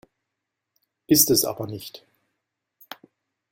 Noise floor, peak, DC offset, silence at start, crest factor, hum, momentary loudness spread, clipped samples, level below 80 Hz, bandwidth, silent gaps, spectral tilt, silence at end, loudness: -83 dBFS; -2 dBFS; under 0.1%; 1.1 s; 24 dB; none; 27 LU; under 0.1%; -60 dBFS; 16.5 kHz; none; -3 dB/octave; 1.55 s; -19 LUFS